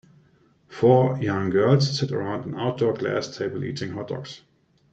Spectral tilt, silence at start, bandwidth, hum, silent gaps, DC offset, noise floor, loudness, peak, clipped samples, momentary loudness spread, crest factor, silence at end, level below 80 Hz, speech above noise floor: -6.5 dB/octave; 0.7 s; 8 kHz; none; none; under 0.1%; -59 dBFS; -24 LUFS; -6 dBFS; under 0.1%; 14 LU; 18 dB; 0.55 s; -62 dBFS; 37 dB